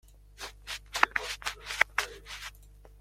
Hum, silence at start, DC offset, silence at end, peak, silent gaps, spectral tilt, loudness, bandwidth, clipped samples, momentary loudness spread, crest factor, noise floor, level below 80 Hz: 50 Hz at -55 dBFS; 0.05 s; under 0.1%; 0 s; -2 dBFS; none; -0.5 dB/octave; -31 LUFS; 16.5 kHz; under 0.1%; 16 LU; 32 dB; -53 dBFS; -54 dBFS